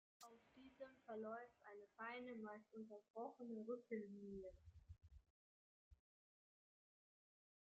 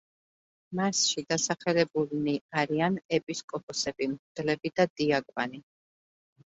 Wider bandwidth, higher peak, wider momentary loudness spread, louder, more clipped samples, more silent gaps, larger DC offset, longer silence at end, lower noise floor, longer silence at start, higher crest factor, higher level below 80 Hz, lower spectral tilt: second, 7.4 kHz vs 8.2 kHz; second, -38 dBFS vs -10 dBFS; first, 15 LU vs 9 LU; second, -56 LUFS vs -29 LUFS; neither; first, 3.10-3.14 s, 5.30-5.91 s vs 2.41-2.49 s, 3.05-3.09 s, 3.23-3.27 s, 3.44-3.48 s, 3.63-3.68 s, 4.19-4.35 s, 4.90-4.96 s; neither; first, 1.7 s vs 1 s; about the same, under -90 dBFS vs under -90 dBFS; second, 0.2 s vs 0.7 s; about the same, 20 dB vs 22 dB; second, -78 dBFS vs -70 dBFS; first, -5 dB/octave vs -3.5 dB/octave